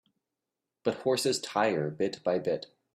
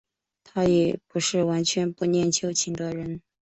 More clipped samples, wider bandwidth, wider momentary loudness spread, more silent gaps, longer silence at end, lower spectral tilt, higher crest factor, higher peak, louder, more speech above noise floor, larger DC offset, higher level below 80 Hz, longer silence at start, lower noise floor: neither; first, 15 kHz vs 8.4 kHz; second, 6 LU vs 10 LU; neither; about the same, 0.3 s vs 0.25 s; about the same, -4 dB/octave vs -4.5 dB/octave; about the same, 20 dB vs 18 dB; second, -12 dBFS vs -8 dBFS; second, -30 LUFS vs -25 LUFS; first, 59 dB vs 36 dB; neither; second, -74 dBFS vs -58 dBFS; first, 0.85 s vs 0.55 s; first, -88 dBFS vs -60 dBFS